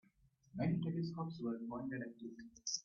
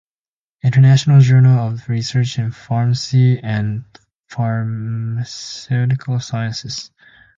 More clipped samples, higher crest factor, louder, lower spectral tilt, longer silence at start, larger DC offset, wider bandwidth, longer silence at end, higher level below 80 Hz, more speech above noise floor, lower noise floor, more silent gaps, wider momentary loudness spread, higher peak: neither; about the same, 18 dB vs 14 dB; second, -43 LUFS vs -16 LUFS; about the same, -6 dB/octave vs -6.5 dB/octave; about the same, 0.55 s vs 0.65 s; neither; about the same, 7.2 kHz vs 7.6 kHz; second, 0.05 s vs 0.5 s; second, -72 dBFS vs -52 dBFS; second, 30 dB vs over 75 dB; second, -73 dBFS vs under -90 dBFS; second, none vs 4.17-4.24 s; about the same, 13 LU vs 15 LU; second, -26 dBFS vs -2 dBFS